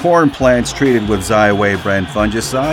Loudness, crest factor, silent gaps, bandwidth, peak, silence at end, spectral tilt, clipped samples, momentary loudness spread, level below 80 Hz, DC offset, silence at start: -14 LUFS; 12 dB; none; 17 kHz; -2 dBFS; 0 s; -5 dB/octave; under 0.1%; 5 LU; -32 dBFS; under 0.1%; 0 s